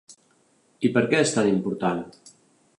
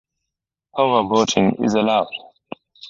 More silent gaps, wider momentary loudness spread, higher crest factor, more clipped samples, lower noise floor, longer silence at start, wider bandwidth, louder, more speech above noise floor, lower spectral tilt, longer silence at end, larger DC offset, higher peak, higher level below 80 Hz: neither; second, 9 LU vs 22 LU; about the same, 18 dB vs 20 dB; neither; second, -63 dBFS vs -83 dBFS; second, 0.1 s vs 0.75 s; first, 11.5 kHz vs 7.6 kHz; second, -23 LUFS vs -18 LUFS; second, 40 dB vs 66 dB; about the same, -5 dB/octave vs -4.5 dB/octave; first, 0.5 s vs 0 s; neither; second, -6 dBFS vs -2 dBFS; second, -66 dBFS vs -56 dBFS